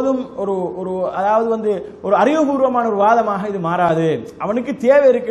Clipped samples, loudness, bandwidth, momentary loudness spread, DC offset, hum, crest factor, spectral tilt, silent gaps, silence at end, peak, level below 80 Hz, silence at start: under 0.1%; -17 LUFS; 11 kHz; 9 LU; under 0.1%; none; 16 dB; -7 dB/octave; none; 0 s; -2 dBFS; -56 dBFS; 0 s